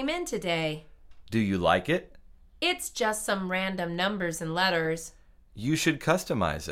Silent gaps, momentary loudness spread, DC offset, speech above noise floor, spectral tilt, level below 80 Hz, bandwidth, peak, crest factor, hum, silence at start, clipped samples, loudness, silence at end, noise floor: none; 7 LU; under 0.1%; 24 dB; -4 dB/octave; -52 dBFS; 16.5 kHz; -10 dBFS; 20 dB; none; 0 s; under 0.1%; -28 LUFS; 0 s; -52 dBFS